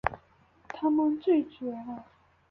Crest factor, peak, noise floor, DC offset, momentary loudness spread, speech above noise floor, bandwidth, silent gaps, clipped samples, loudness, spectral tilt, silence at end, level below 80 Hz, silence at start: 24 dB; -6 dBFS; -62 dBFS; under 0.1%; 19 LU; 34 dB; 6.4 kHz; none; under 0.1%; -29 LUFS; -8 dB/octave; 0.5 s; -58 dBFS; 0.05 s